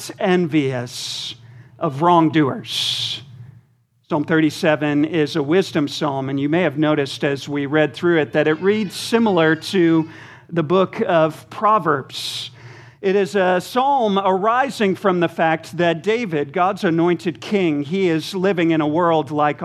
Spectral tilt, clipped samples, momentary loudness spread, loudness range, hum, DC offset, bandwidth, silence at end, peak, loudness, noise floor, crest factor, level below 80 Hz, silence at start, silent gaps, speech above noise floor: -5.5 dB/octave; under 0.1%; 8 LU; 2 LU; none; under 0.1%; 14 kHz; 0 s; -2 dBFS; -19 LUFS; -58 dBFS; 18 dB; -68 dBFS; 0 s; none; 40 dB